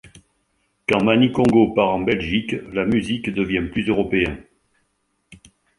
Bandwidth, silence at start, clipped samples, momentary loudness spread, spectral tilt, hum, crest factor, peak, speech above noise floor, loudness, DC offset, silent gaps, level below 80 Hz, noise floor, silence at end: 11.5 kHz; 0.9 s; under 0.1%; 8 LU; -6.5 dB/octave; none; 20 dB; -2 dBFS; 50 dB; -20 LUFS; under 0.1%; none; -44 dBFS; -69 dBFS; 0.45 s